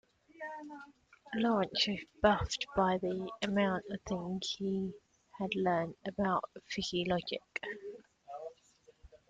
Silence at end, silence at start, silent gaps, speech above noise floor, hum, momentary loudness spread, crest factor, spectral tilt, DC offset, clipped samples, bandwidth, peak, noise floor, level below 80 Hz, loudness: 0.15 s; 0.35 s; none; 31 dB; none; 16 LU; 22 dB; -5 dB/octave; under 0.1%; under 0.1%; 9.2 kHz; -14 dBFS; -66 dBFS; -60 dBFS; -35 LUFS